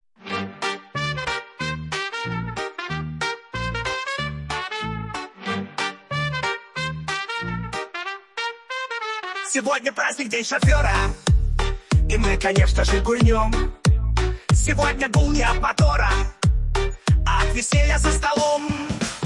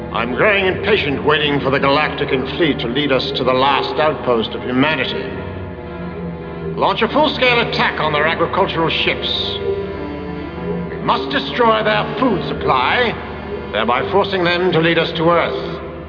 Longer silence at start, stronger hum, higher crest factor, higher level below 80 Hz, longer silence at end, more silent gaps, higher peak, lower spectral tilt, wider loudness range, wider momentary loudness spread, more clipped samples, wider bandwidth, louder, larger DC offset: first, 0.25 s vs 0 s; neither; about the same, 16 dB vs 14 dB; first, -26 dBFS vs -38 dBFS; about the same, 0 s vs 0 s; neither; second, -6 dBFS vs -2 dBFS; second, -4.5 dB/octave vs -7 dB/octave; first, 7 LU vs 3 LU; about the same, 10 LU vs 12 LU; neither; first, 11.5 kHz vs 5.4 kHz; second, -23 LUFS vs -16 LUFS; neither